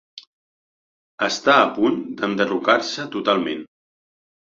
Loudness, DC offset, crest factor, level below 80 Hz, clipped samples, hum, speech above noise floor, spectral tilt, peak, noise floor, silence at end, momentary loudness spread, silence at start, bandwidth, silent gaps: -20 LUFS; under 0.1%; 20 dB; -66 dBFS; under 0.1%; none; over 70 dB; -4 dB/octave; -2 dBFS; under -90 dBFS; 0.85 s; 10 LU; 0.15 s; 7.8 kHz; 0.27-1.18 s